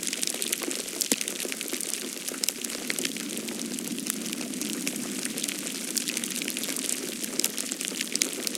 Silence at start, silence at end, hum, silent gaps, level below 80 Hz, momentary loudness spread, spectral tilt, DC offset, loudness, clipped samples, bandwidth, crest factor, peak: 0 s; 0 s; none; none; -78 dBFS; 5 LU; -1 dB/octave; under 0.1%; -29 LUFS; under 0.1%; 17 kHz; 32 dB; 0 dBFS